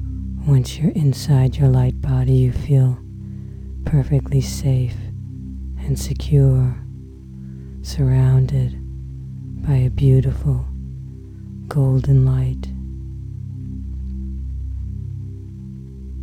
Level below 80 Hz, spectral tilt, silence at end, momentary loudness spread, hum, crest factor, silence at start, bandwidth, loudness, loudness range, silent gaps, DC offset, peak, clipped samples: -30 dBFS; -8 dB/octave; 0 s; 19 LU; 50 Hz at -55 dBFS; 16 dB; 0 s; 10 kHz; -19 LUFS; 5 LU; none; under 0.1%; -4 dBFS; under 0.1%